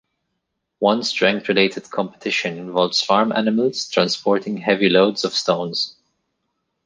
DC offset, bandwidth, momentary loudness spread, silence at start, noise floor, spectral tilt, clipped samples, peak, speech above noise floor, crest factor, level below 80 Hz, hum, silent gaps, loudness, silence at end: under 0.1%; 9.8 kHz; 7 LU; 0.8 s; -76 dBFS; -4 dB/octave; under 0.1%; -2 dBFS; 57 dB; 18 dB; -66 dBFS; none; none; -19 LUFS; 0.95 s